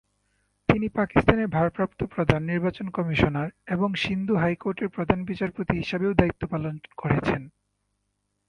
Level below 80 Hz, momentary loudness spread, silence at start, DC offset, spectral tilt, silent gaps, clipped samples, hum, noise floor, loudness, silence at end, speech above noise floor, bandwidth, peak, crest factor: -44 dBFS; 8 LU; 0.7 s; under 0.1%; -8 dB/octave; none; under 0.1%; 50 Hz at -50 dBFS; -76 dBFS; -26 LUFS; 1 s; 51 dB; 10 kHz; 0 dBFS; 26 dB